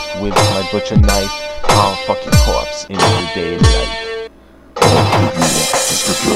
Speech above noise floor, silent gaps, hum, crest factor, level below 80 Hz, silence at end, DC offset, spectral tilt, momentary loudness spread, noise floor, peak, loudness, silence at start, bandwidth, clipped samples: 26 dB; none; none; 14 dB; -22 dBFS; 0 s; under 0.1%; -4 dB/octave; 9 LU; -40 dBFS; 0 dBFS; -14 LUFS; 0 s; 16.5 kHz; under 0.1%